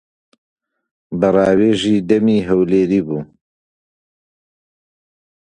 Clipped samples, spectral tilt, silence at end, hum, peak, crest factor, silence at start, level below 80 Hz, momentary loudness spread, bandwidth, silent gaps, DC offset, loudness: under 0.1%; -7 dB/octave; 2.25 s; none; 0 dBFS; 18 dB; 1.1 s; -50 dBFS; 10 LU; 10 kHz; none; under 0.1%; -15 LUFS